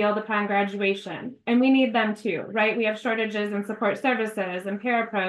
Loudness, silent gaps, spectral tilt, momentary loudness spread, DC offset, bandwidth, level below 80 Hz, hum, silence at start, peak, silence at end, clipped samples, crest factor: -24 LUFS; none; -6 dB/octave; 9 LU; under 0.1%; 12 kHz; -76 dBFS; none; 0 s; -10 dBFS; 0 s; under 0.1%; 14 dB